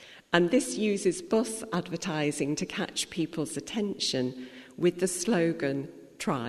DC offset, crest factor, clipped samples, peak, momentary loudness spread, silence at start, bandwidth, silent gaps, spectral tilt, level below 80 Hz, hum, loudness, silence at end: under 0.1%; 22 dB; under 0.1%; -6 dBFS; 8 LU; 0 s; 13.5 kHz; none; -4.5 dB/octave; -64 dBFS; none; -29 LUFS; 0 s